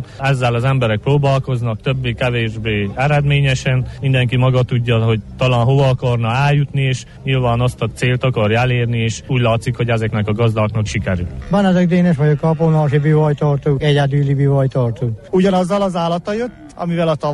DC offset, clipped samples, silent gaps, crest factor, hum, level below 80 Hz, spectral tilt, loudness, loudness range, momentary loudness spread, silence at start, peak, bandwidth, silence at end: under 0.1%; under 0.1%; none; 10 dB; none; -38 dBFS; -7 dB/octave; -16 LUFS; 2 LU; 6 LU; 0 s; -4 dBFS; 11.5 kHz; 0 s